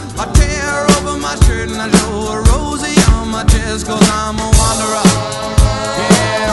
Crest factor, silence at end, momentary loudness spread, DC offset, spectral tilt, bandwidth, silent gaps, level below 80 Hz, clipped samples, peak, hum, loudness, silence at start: 12 dB; 0 s; 5 LU; under 0.1%; -4.5 dB/octave; 12 kHz; none; -16 dBFS; 0.2%; 0 dBFS; none; -13 LUFS; 0 s